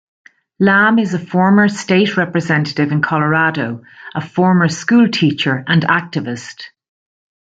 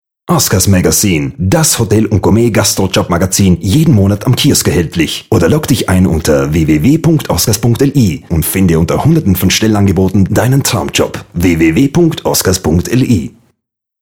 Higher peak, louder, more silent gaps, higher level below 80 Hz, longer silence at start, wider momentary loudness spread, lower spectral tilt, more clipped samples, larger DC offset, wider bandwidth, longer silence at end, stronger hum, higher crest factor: about the same, -2 dBFS vs 0 dBFS; second, -14 LUFS vs -10 LUFS; neither; second, -58 dBFS vs -30 dBFS; first, 0.6 s vs 0.3 s; first, 14 LU vs 4 LU; about the same, -6 dB/octave vs -5 dB/octave; neither; neither; second, 8 kHz vs over 20 kHz; first, 0.85 s vs 0.7 s; neither; about the same, 14 dB vs 10 dB